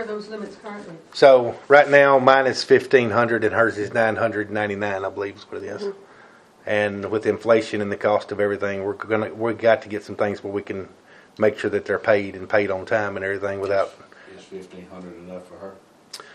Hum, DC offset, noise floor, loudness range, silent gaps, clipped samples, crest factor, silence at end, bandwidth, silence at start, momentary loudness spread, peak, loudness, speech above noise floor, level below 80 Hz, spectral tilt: none; under 0.1%; -49 dBFS; 9 LU; none; under 0.1%; 22 dB; 0.15 s; 11 kHz; 0 s; 24 LU; 0 dBFS; -20 LUFS; 29 dB; -68 dBFS; -5.5 dB/octave